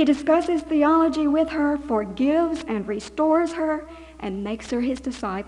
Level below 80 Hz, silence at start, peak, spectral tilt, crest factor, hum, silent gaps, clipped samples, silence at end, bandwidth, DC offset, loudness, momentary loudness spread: -48 dBFS; 0 s; -10 dBFS; -6 dB/octave; 14 dB; none; none; under 0.1%; 0 s; 10.5 kHz; under 0.1%; -23 LUFS; 11 LU